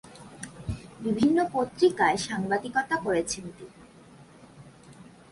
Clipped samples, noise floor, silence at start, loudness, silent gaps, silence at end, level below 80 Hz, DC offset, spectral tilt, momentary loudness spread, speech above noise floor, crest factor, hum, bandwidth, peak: under 0.1%; -52 dBFS; 0.05 s; -27 LUFS; none; 0.3 s; -54 dBFS; under 0.1%; -4.5 dB/octave; 20 LU; 26 dB; 18 dB; none; 11.5 kHz; -10 dBFS